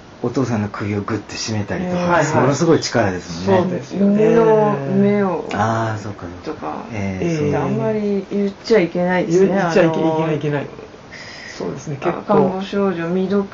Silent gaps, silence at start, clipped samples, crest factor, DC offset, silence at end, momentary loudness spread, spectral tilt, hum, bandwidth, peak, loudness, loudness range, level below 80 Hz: none; 0 s; under 0.1%; 14 dB; under 0.1%; 0 s; 13 LU; -6 dB/octave; none; 7.8 kHz; -4 dBFS; -18 LUFS; 5 LU; -50 dBFS